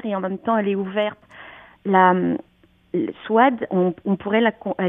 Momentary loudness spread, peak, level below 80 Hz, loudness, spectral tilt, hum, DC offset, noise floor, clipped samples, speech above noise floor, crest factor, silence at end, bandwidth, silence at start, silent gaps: 13 LU; 0 dBFS; -64 dBFS; -21 LUFS; -10 dB/octave; none; under 0.1%; -43 dBFS; under 0.1%; 24 dB; 20 dB; 0 s; 3.8 kHz; 0.05 s; none